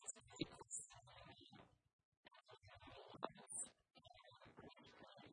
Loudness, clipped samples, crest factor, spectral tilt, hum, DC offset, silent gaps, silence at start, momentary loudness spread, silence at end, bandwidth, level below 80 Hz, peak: -55 LUFS; under 0.1%; 30 dB; -2.5 dB/octave; none; under 0.1%; 1.93-2.23 s; 0 s; 16 LU; 0 s; 10 kHz; -82 dBFS; -30 dBFS